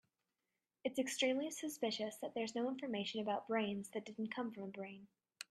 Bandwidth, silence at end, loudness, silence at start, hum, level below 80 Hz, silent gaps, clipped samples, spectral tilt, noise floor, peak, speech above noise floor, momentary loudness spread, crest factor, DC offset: 14 kHz; 0.1 s; -41 LUFS; 0.85 s; none; -86 dBFS; none; under 0.1%; -3.5 dB/octave; under -90 dBFS; -24 dBFS; over 49 dB; 11 LU; 18 dB; under 0.1%